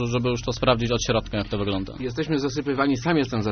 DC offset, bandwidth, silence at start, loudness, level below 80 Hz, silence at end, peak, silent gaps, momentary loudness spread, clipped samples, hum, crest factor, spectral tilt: under 0.1%; 6.6 kHz; 0 s; -24 LUFS; -40 dBFS; 0 s; -6 dBFS; none; 6 LU; under 0.1%; none; 18 dB; -5 dB/octave